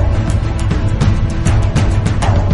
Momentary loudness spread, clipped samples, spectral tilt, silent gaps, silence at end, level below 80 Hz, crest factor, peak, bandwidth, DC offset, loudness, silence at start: 3 LU; under 0.1%; -6.5 dB/octave; none; 0 s; -16 dBFS; 12 dB; 0 dBFS; 11.5 kHz; under 0.1%; -15 LUFS; 0 s